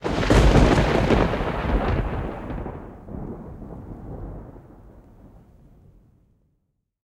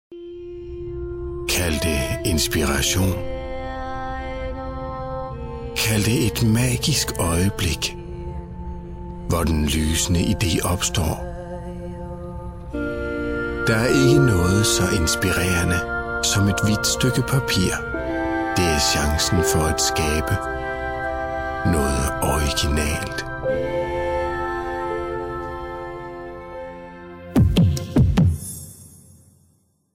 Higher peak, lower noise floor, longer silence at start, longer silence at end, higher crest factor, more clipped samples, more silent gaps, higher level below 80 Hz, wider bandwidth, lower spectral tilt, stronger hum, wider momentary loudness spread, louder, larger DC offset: about the same, -2 dBFS vs -4 dBFS; first, -72 dBFS vs -62 dBFS; about the same, 0 s vs 0.1 s; first, 2.05 s vs 1 s; about the same, 22 dB vs 18 dB; neither; neither; about the same, -28 dBFS vs -32 dBFS; second, 11.5 kHz vs 16.5 kHz; first, -6.5 dB/octave vs -4.5 dB/octave; neither; first, 22 LU vs 15 LU; about the same, -21 LUFS vs -21 LUFS; neither